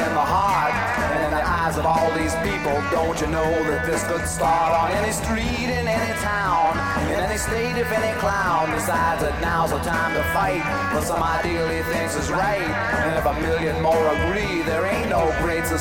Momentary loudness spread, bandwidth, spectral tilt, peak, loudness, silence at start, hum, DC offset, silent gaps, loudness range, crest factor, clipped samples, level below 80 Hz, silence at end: 3 LU; 17 kHz; -4.5 dB/octave; -8 dBFS; -21 LUFS; 0 s; none; 0.3%; none; 1 LU; 14 dB; under 0.1%; -36 dBFS; 0 s